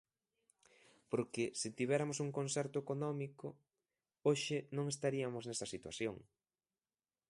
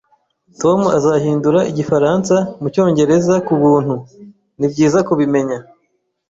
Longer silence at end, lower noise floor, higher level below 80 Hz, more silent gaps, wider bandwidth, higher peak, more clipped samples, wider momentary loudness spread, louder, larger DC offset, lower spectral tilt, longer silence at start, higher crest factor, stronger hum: first, 1.05 s vs 0.65 s; first, under -90 dBFS vs -66 dBFS; second, -78 dBFS vs -52 dBFS; neither; first, 11.5 kHz vs 7.8 kHz; second, -20 dBFS vs -2 dBFS; neither; about the same, 8 LU vs 8 LU; second, -40 LUFS vs -15 LUFS; neither; second, -4.5 dB/octave vs -7 dB/octave; first, 1.1 s vs 0.6 s; first, 22 dB vs 12 dB; neither